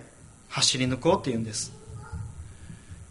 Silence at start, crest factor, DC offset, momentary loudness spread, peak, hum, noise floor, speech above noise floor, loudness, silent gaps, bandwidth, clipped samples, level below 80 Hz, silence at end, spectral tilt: 0 s; 22 dB; under 0.1%; 23 LU; -8 dBFS; none; -50 dBFS; 24 dB; -26 LUFS; none; 11.5 kHz; under 0.1%; -48 dBFS; 0 s; -3.5 dB/octave